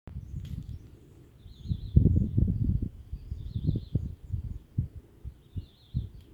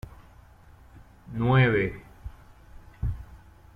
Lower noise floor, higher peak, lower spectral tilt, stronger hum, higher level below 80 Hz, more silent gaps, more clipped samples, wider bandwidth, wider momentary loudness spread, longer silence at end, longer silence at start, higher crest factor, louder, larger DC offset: about the same, -53 dBFS vs -52 dBFS; first, -6 dBFS vs -10 dBFS; first, -10.5 dB/octave vs -8.5 dB/octave; neither; first, -38 dBFS vs -44 dBFS; neither; neither; about the same, 4.7 kHz vs 4.8 kHz; second, 21 LU vs 26 LU; second, 0 s vs 0.4 s; about the same, 0.05 s vs 0.05 s; first, 26 dB vs 20 dB; second, -32 LUFS vs -25 LUFS; neither